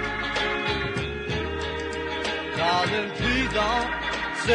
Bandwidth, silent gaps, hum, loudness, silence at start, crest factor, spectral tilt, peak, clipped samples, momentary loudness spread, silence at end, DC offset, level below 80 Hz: 11 kHz; none; none; -26 LUFS; 0 s; 16 dB; -4.5 dB/octave; -10 dBFS; under 0.1%; 6 LU; 0 s; under 0.1%; -40 dBFS